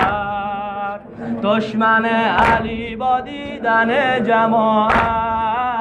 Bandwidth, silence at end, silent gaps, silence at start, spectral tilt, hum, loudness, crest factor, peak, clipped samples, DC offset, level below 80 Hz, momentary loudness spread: 10.5 kHz; 0 s; none; 0 s; -6.5 dB/octave; none; -17 LUFS; 14 dB; -4 dBFS; under 0.1%; under 0.1%; -40 dBFS; 10 LU